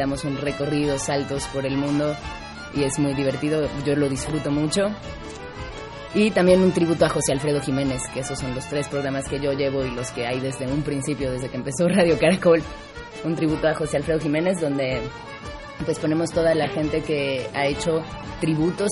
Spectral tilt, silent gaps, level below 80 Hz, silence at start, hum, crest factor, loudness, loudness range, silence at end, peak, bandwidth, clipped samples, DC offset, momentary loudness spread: -5.5 dB/octave; none; -44 dBFS; 0 s; none; 18 dB; -23 LUFS; 4 LU; 0 s; -4 dBFS; 11.5 kHz; under 0.1%; under 0.1%; 15 LU